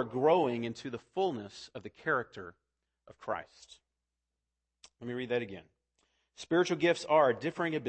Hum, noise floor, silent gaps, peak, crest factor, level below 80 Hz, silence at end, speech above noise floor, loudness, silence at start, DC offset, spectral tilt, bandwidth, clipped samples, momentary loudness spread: none; -88 dBFS; none; -14 dBFS; 20 dB; -74 dBFS; 0 s; 55 dB; -32 LUFS; 0 s; under 0.1%; -5.5 dB/octave; 8.8 kHz; under 0.1%; 20 LU